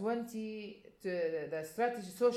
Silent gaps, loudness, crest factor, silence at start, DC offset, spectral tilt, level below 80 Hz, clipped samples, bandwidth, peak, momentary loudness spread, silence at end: none; -38 LUFS; 16 dB; 0 s; under 0.1%; -5.5 dB/octave; -78 dBFS; under 0.1%; 15 kHz; -20 dBFS; 9 LU; 0 s